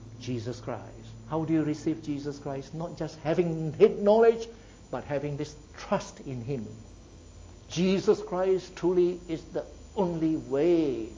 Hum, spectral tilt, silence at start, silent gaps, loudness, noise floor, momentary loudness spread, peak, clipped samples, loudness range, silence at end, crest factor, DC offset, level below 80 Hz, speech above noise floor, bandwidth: none; -7 dB/octave; 0 s; none; -29 LUFS; -49 dBFS; 15 LU; -8 dBFS; under 0.1%; 6 LU; 0 s; 20 dB; under 0.1%; -54 dBFS; 21 dB; 7.8 kHz